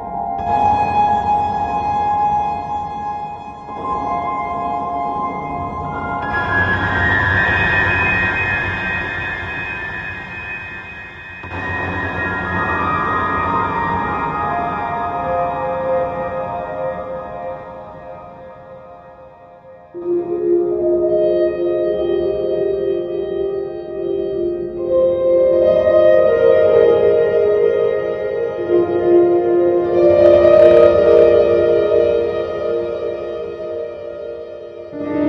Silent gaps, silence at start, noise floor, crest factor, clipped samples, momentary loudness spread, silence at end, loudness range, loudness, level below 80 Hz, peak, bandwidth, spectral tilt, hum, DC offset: none; 0 s; -41 dBFS; 16 dB; under 0.1%; 16 LU; 0 s; 12 LU; -16 LUFS; -42 dBFS; 0 dBFS; 7.2 kHz; -8 dB/octave; none; under 0.1%